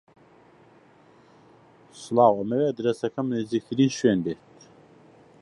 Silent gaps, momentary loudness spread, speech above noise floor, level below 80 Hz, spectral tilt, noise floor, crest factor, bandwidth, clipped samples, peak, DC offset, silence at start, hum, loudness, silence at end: none; 10 LU; 32 dB; -66 dBFS; -6.5 dB/octave; -55 dBFS; 22 dB; 11.5 kHz; under 0.1%; -4 dBFS; under 0.1%; 1.95 s; none; -24 LUFS; 1.05 s